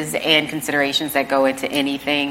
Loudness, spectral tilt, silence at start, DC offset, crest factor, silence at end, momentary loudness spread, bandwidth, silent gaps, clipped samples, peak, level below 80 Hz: -19 LUFS; -3 dB/octave; 0 s; under 0.1%; 20 dB; 0 s; 5 LU; 16.5 kHz; none; under 0.1%; 0 dBFS; -56 dBFS